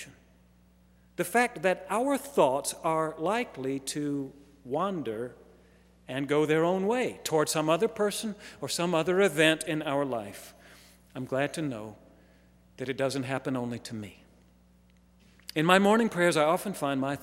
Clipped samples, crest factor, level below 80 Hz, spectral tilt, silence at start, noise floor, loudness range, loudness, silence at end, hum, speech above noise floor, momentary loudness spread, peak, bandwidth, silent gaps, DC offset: under 0.1%; 26 dB; -64 dBFS; -4.5 dB/octave; 0 s; -61 dBFS; 8 LU; -28 LUFS; 0 s; 60 Hz at -60 dBFS; 32 dB; 17 LU; -4 dBFS; 16 kHz; none; under 0.1%